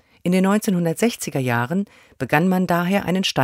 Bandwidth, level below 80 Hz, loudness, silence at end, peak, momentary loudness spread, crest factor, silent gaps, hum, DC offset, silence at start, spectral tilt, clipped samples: 16 kHz; -56 dBFS; -20 LUFS; 0 s; -2 dBFS; 6 LU; 20 dB; none; none; under 0.1%; 0.25 s; -5.5 dB/octave; under 0.1%